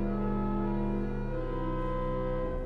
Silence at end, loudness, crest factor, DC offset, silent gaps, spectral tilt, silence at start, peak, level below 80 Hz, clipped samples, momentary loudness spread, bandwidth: 0 s; -33 LUFS; 10 dB; under 0.1%; none; -10 dB/octave; 0 s; -20 dBFS; -36 dBFS; under 0.1%; 3 LU; 4.6 kHz